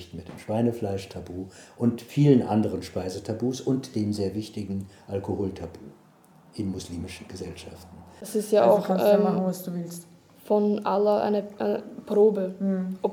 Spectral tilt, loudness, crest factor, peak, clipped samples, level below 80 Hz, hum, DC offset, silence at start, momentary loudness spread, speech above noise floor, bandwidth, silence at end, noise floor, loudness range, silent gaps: -7 dB/octave; -26 LUFS; 20 dB; -6 dBFS; under 0.1%; -60 dBFS; none; under 0.1%; 0 s; 18 LU; 30 dB; 17 kHz; 0 s; -55 dBFS; 11 LU; none